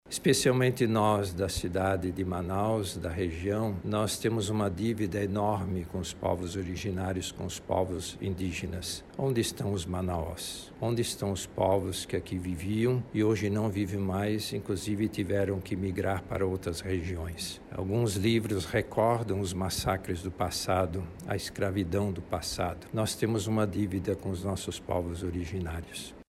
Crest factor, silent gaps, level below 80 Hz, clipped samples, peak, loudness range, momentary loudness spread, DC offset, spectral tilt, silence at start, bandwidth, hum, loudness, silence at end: 18 dB; none; -50 dBFS; under 0.1%; -12 dBFS; 3 LU; 8 LU; under 0.1%; -5.5 dB/octave; 0.05 s; 15.5 kHz; none; -31 LUFS; 0.05 s